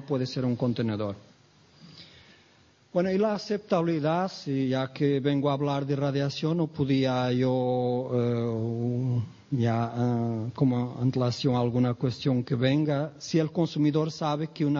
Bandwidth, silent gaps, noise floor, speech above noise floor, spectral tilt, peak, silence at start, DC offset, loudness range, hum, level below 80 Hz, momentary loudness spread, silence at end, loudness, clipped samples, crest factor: 7.2 kHz; none; -60 dBFS; 34 dB; -7.5 dB/octave; -10 dBFS; 0 s; under 0.1%; 4 LU; none; -64 dBFS; 5 LU; 0 s; -27 LUFS; under 0.1%; 16 dB